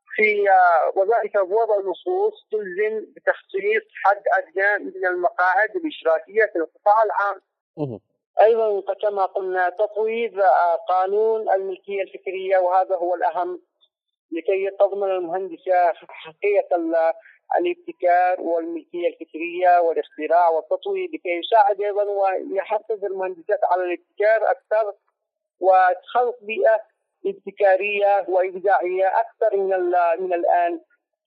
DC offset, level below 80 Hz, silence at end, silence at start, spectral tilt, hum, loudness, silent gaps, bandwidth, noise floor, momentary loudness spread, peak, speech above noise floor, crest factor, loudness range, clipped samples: under 0.1%; -88 dBFS; 0.45 s; 0.1 s; -7 dB/octave; none; -21 LUFS; 7.61-7.74 s, 8.26-8.34 s, 14.19-14.29 s; 5.4 kHz; -79 dBFS; 11 LU; -4 dBFS; 59 dB; 16 dB; 3 LU; under 0.1%